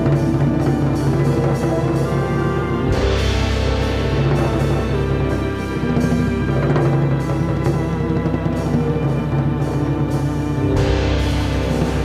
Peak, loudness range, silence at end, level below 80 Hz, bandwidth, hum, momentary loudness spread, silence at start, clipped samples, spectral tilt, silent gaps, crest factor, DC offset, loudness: -6 dBFS; 1 LU; 0 s; -26 dBFS; 13 kHz; none; 3 LU; 0 s; under 0.1%; -7.5 dB/octave; none; 12 dB; under 0.1%; -19 LUFS